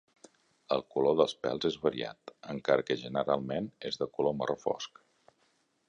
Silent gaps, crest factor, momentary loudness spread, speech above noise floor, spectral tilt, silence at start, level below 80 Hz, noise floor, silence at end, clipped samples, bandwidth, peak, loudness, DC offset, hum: none; 22 dB; 10 LU; 41 dB; -5.5 dB/octave; 0.7 s; -68 dBFS; -73 dBFS; 1 s; under 0.1%; 10 kHz; -10 dBFS; -32 LUFS; under 0.1%; none